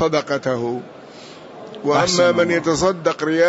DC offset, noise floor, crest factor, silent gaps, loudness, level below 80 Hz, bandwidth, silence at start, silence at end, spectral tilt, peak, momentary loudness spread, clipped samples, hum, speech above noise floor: under 0.1%; -39 dBFS; 14 dB; none; -18 LUFS; -52 dBFS; 8 kHz; 0 s; 0 s; -4.5 dB/octave; -4 dBFS; 23 LU; under 0.1%; none; 21 dB